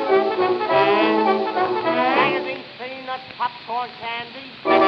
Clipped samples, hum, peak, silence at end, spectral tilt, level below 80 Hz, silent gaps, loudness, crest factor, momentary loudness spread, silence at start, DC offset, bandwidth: under 0.1%; none; -4 dBFS; 0 s; -6.5 dB/octave; -66 dBFS; none; -21 LUFS; 16 dB; 14 LU; 0 s; under 0.1%; 6.2 kHz